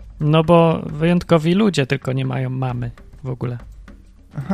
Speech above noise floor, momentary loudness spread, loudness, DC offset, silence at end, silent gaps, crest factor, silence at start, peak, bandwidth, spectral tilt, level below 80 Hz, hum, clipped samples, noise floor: 25 dB; 18 LU; -18 LUFS; under 0.1%; 0 s; none; 18 dB; 0 s; 0 dBFS; 11 kHz; -7.5 dB/octave; -42 dBFS; none; under 0.1%; -43 dBFS